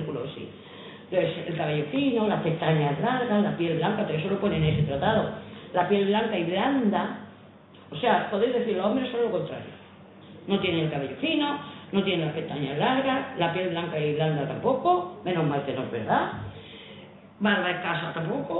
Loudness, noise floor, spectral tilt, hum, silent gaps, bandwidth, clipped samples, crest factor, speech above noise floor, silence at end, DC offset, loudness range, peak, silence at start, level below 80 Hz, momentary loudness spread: -26 LUFS; -50 dBFS; -10.5 dB/octave; none; none; 4.1 kHz; under 0.1%; 18 dB; 24 dB; 0 s; under 0.1%; 3 LU; -10 dBFS; 0 s; -56 dBFS; 15 LU